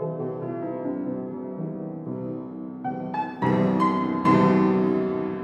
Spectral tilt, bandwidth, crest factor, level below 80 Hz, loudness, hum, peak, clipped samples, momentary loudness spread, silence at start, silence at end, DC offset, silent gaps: -9 dB/octave; 8.2 kHz; 16 dB; -62 dBFS; -25 LUFS; none; -8 dBFS; under 0.1%; 14 LU; 0 s; 0 s; under 0.1%; none